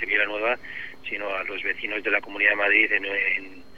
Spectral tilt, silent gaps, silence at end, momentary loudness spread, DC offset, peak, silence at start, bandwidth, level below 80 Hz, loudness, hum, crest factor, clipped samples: -4 dB/octave; none; 0.15 s; 12 LU; 0.8%; -4 dBFS; 0 s; 15 kHz; -60 dBFS; -23 LUFS; none; 22 dB; under 0.1%